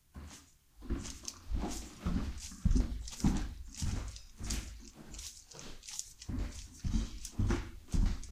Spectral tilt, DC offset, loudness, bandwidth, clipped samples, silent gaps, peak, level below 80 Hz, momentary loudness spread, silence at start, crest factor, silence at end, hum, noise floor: -5 dB/octave; under 0.1%; -40 LUFS; 15.5 kHz; under 0.1%; none; -16 dBFS; -40 dBFS; 15 LU; 0.15 s; 20 dB; 0 s; none; -58 dBFS